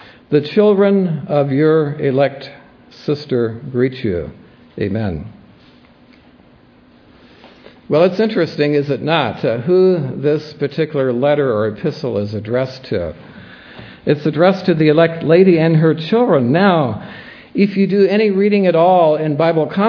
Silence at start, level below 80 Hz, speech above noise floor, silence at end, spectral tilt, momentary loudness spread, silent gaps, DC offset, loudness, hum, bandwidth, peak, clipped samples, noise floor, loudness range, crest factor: 0.3 s; -50 dBFS; 33 dB; 0 s; -9 dB/octave; 13 LU; none; under 0.1%; -15 LUFS; none; 5.4 kHz; 0 dBFS; under 0.1%; -47 dBFS; 10 LU; 16 dB